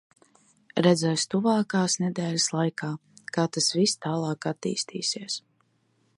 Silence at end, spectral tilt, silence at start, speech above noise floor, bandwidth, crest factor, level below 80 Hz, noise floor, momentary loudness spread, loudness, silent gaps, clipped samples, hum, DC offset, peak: 0.8 s; -4 dB/octave; 0.75 s; 43 dB; 11.5 kHz; 22 dB; -72 dBFS; -68 dBFS; 11 LU; -26 LUFS; none; under 0.1%; none; under 0.1%; -6 dBFS